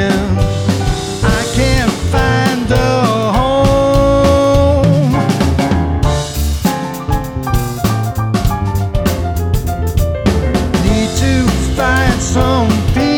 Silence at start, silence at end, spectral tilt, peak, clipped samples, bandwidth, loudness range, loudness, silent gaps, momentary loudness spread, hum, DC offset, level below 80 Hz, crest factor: 0 s; 0 s; -6 dB/octave; 0 dBFS; under 0.1%; 19.5 kHz; 5 LU; -14 LUFS; none; 6 LU; none; under 0.1%; -20 dBFS; 12 dB